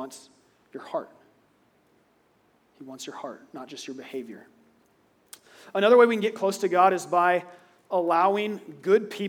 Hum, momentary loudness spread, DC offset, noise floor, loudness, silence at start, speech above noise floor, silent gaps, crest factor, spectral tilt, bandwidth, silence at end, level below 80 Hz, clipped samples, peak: none; 21 LU; under 0.1%; -65 dBFS; -23 LUFS; 0 s; 40 dB; none; 22 dB; -4.5 dB/octave; 17 kHz; 0 s; -86 dBFS; under 0.1%; -6 dBFS